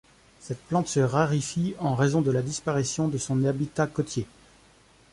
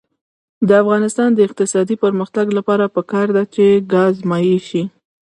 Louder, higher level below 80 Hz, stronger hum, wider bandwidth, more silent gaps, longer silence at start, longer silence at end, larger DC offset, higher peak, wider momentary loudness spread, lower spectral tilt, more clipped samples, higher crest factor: second, -26 LUFS vs -15 LUFS; first, -56 dBFS vs -62 dBFS; neither; about the same, 11.5 kHz vs 11.5 kHz; neither; second, 0.4 s vs 0.6 s; first, 0.85 s vs 0.5 s; neither; second, -8 dBFS vs 0 dBFS; about the same, 8 LU vs 6 LU; about the same, -6 dB/octave vs -6 dB/octave; neither; about the same, 18 dB vs 16 dB